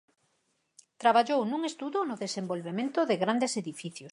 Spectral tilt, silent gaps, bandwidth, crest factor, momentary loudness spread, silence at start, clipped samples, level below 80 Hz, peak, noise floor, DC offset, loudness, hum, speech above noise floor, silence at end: -4.5 dB/octave; none; 11.5 kHz; 20 dB; 10 LU; 1 s; under 0.1%; -84 dBFS; -10 dBFS; -75 dBFS; under 0.1%; -29 LUFS; none; 46 dB; 0 s